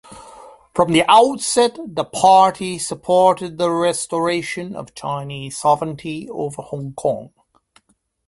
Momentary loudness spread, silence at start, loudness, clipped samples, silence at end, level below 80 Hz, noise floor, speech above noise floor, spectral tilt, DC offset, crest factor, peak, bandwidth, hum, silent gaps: 16 LU; 0.1 s; -18 LUFS; under 0.1%; 1 s; -56 dBFS; -63 dBFS; 45 dB; -4 dB/octave; under 0.1%; 18 dB; 0 dBFS; 11.5 kHz; none; none